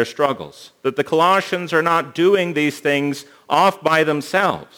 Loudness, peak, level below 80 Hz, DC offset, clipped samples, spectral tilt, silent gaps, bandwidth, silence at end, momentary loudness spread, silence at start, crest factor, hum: -18 LUFS; -2 dBFS; -66 dBFS; under 0.1%; under 0.1%; -5 dB/octave; none; over 20 kHz; 0.15 s; 9 LU; 0 s; 18 dB; none